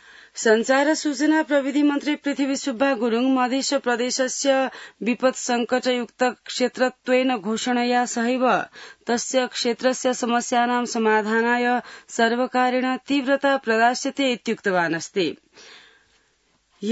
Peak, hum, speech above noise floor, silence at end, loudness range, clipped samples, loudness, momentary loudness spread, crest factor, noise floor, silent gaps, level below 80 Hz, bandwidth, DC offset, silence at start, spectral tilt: -6 dBFS; none; 43 dB; 0 s; 2 LU; under 0.1%; -22 LUFS; 6 LU; 16 dB; -65 dBFS; none; -74 dBFS; 8 kHz; under 0.1%; 0.35 s; -3 dB/octave